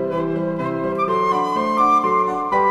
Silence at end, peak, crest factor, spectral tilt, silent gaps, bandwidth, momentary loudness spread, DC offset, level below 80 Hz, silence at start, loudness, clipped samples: 0 s; -6 dBFS; 14 dB; -7 dB/octave; none; 12.5 kHz; 7 LU; under 0.1%; -56 dBFS; 0 s; -19 LUFS; under 0.1%